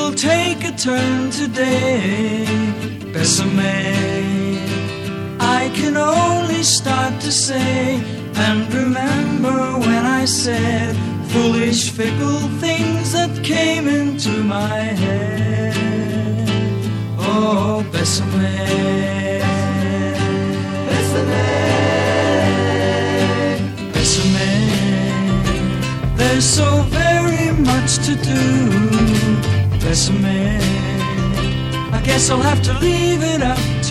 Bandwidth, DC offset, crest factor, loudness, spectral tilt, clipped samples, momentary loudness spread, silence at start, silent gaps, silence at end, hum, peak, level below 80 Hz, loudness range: 14.5 kHz; under 0.1%; 16 dB; -17 LUFS; -4.5 dB/octave; under 0.1%; 5 LU; 0 s; none; 0 s; none; 0 dBFS; -34 dBFS; 3 LU